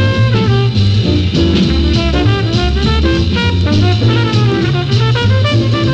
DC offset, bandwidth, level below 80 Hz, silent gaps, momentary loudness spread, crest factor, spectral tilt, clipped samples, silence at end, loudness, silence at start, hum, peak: under 0.1%; 8 kHz; -20 dBFS; none; 2 LU; 8 dB; -7 dB/octave; under 0.1%; 0 s; -12 LUFS; 0 s; none; -2 dBFS